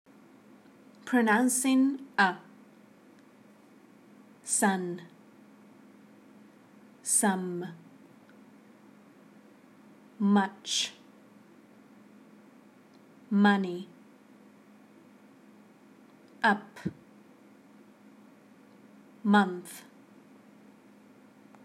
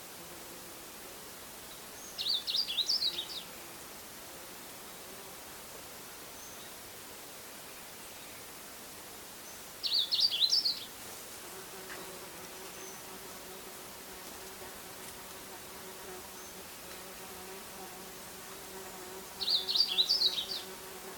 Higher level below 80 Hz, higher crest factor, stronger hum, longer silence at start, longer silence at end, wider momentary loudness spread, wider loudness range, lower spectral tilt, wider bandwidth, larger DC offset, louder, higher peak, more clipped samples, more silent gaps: second, -84 dBFS vs -68 dBFS; about the same, 24 dB vs 24 dB; neither; first, 1.05 s vs 0 s; first, 1.85 s vs 0 s; about the same, 19 LU vs 18 LU; second, 7 LU vs 14 LU; first, -3.5 dB/octave vs -0.5 dB/octave; second, 15.5 kHz vs 19 kHz; neither; first, -28 LUFS vs -36 LUFS; first, -10 dBFS vs -16 dBFS; neither; neither